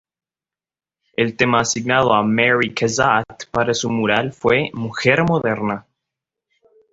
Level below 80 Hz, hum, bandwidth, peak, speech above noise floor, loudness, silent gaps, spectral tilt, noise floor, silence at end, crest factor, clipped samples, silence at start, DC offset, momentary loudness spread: -52 dBFS; none; 8 kHz; -2 dBFS; over 72 dB; -18 LUFS; none; -4.5 dB/octave; under -90 dBFS; 1.15 s; 18 dB; under 0.1%; 1.2 s; under 0.1%; 8 LU